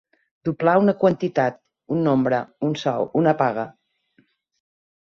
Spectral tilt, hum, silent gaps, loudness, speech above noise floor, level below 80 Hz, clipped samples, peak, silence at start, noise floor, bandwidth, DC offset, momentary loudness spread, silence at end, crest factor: -8 dB/octave; none; none; -21 LUFS; 43 dB; -64 dBFS; under 0.1%; -4 dBFS; 0.45 s; -63 dBFS; 7.2 kHz; under 0.1%; 11 LU; 1.35 s; 18 dB